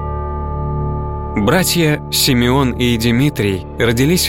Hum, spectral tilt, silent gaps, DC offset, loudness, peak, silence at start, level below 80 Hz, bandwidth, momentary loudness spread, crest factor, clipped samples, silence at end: none; -4.5 dB/octave; none; under 0.1%; -15 LUFS; -2 dBFS; 0 s; -28 dBFS; 17 kHz; 10 LU; 14 dB; under 0.1%; 0 s